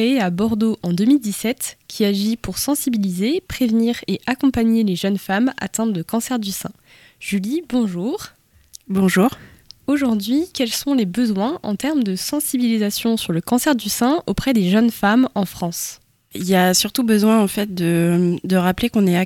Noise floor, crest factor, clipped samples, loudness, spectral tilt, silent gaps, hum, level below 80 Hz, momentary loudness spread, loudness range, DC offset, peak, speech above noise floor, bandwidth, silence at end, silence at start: -46 dBFS; 16 dB; under 0.1%; -19 LUFS; -5 dB/octave; none; none; -46 dBFS; 8 LU; 4 LU; under 0.1%; -2 dBFS; 28 dB; 17.5 kHz; 0 s; 0 s